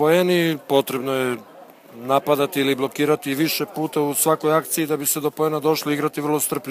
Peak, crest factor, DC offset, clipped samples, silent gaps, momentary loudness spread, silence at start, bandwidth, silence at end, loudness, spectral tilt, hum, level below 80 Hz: -2 dBFS; 18 dB; under 0.1%; under 0.1%; none; 5 LU; 0 s; 16 kHz; 0 s; -21 LUFS; -4 dB/octave; none; -70 dBFS